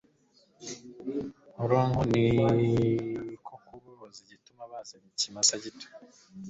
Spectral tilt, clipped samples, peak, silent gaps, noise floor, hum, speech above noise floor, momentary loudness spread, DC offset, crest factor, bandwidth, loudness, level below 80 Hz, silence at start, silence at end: -4.5 dB/octave; under 0.1%; -10 dBFS; none; -65 dBFS; none; 37 dB; 23 LU; under 0.1%; 20 dB; 8.2 kHz; -27 LUFS; -54 dBFS; 0.6 s; 0 s